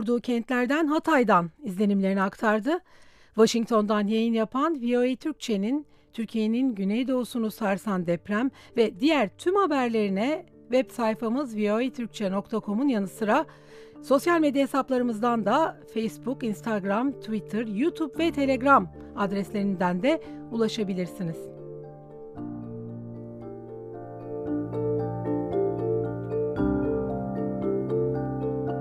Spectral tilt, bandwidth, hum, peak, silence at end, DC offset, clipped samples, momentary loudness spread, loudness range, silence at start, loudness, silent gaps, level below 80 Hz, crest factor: -6.5 dB/octave; 14.5 kHz; none; -6 dBFS; 0 s; under 0.1%; under 0.1%; 15 LU; 7 LU; 0 s; -26 LUFS; none; -54 dBFS; 20 dB